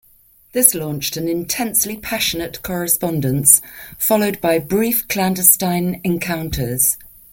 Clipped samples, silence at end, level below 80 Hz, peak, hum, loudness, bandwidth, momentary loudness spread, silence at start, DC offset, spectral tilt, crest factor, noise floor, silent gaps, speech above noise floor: under 0.1%; 0.25 s; -44 dBFS; 0 dBFS; none; -16 LUFS; 17 kHz; 11 LU; 0.55 s; under 0.1%; -3.5 dB/octave; 18 dB; -52 dBFS; none; 34 dB